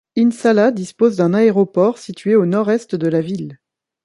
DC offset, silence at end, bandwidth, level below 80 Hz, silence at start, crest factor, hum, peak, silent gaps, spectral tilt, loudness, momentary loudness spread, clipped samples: under 0.1%; 0.5 s; 11.5 kHz; -64 dBFS; 0.15 s; 14 dB; none; -2 dBFS; none; -7.5 dB/octave; -16 LUFS; 9 LU; under 0.1%